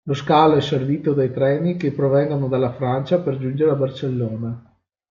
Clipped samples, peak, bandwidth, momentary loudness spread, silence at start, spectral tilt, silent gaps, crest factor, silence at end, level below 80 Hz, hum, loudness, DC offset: under 0.1%; -2 dBFS; 7.4 kHz; 9 LU; 0.05 s; -8 dB/octave; none; 16 dB; 0.5 s; -60 dBFS; none; -20 LUFS; under 0.1%